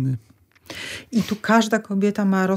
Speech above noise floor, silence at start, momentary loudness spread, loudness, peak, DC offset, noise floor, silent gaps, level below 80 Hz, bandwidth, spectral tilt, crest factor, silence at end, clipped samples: 21 dB; 0 s; 14 LU; -22 LUFS; -4 dBFS; under 0.1%; -41 dBFS; none; -62 dBFS; 16 kHz; -6 dB/octave; 18 dB; 0 s; under 0.1%